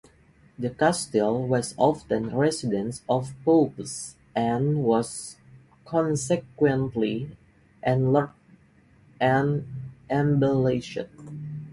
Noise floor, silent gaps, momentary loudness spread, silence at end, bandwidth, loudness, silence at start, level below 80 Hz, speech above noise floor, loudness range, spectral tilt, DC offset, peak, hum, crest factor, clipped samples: -57 dBFS; none; 14 LU; 0 s; 11.5 kHz; -25 LUFS; 0.6 s; -58 dBFS; 33 dB; 2 LU; -6 dB/octave; under 0.1%; -8 dBFS; none; 18 dB; under 0.1%